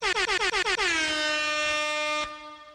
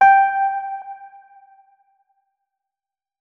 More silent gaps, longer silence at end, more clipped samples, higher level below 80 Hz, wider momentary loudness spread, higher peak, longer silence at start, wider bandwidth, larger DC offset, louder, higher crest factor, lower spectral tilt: neither; second, 0 s vs 2.15 s; neither; first, -54 dBFS vs -72 dBFS; second, 6 LU vs 24 LU; second, -14 dBFS vs -2 dBFS; about the same, 0 s vs 0 s; first, 14 kHz vs 5.8 kHz; neither; second, -25 LUFS vs -18 LUFS; about the same, 14 dB vs 18 dB; second, -0.5 dB/octave vs -2.5 dB/octave